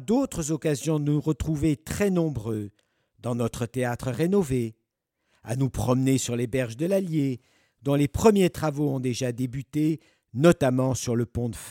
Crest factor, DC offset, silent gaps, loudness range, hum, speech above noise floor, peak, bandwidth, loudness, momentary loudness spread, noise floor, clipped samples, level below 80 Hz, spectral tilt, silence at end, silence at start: 20 dB; under 0.1%; none; 4 LU; none; 54 dB; -6 dBFS; 17 kHz; -26 LUFS; 11 LU; -79 dBFS; under 0.1%; -48 dBFS; -6.5 dB/octave; 0 s; 0 s